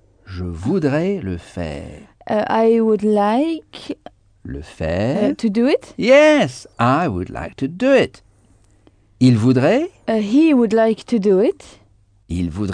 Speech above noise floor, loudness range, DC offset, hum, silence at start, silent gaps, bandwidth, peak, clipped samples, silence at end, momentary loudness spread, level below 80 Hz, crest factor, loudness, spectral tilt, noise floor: 36 dB; 3 LU; under 0.1%; none; 0.3 s; none; 10 kHz; -2 dBFS; under 0.1%; 0 s; 17 LU; -44 dBFS; 16 dB; -17 LUFS; -7 dB/octave; -53 dBFS